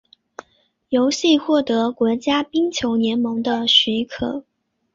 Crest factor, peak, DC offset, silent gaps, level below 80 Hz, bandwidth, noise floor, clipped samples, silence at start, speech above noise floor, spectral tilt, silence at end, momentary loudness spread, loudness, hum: 18 dB; -2 dBFS; under 0.1%; none; -54 dBFS; 7.6 kHz; -62 dBFS; under 0.1%; 0.9 s; 44 dB; -3.5 dB/octave; 0.55 s; 9 LU; -19 LUFS; none